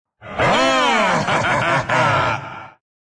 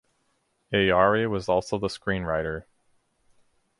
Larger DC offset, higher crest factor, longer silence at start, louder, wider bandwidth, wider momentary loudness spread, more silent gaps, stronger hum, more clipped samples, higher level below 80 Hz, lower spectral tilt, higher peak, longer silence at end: neither; second, 12 dB vs 22 dB; second, 0.2 s vs 0.7 s; first, -17 LUFS vs -25 LUFS; about the same, 10.5 kHz vs 11.5 kHz; first, 14 LU vs 10 LU; neither; neither; neither; about the same, -46 dBFS vs -50 dBFS; second, -4 dB/octave vs -5.5 dB/octave; about the same, -6 dBFS vs -6 dBFS; second, 0.5 s vs 1.2 s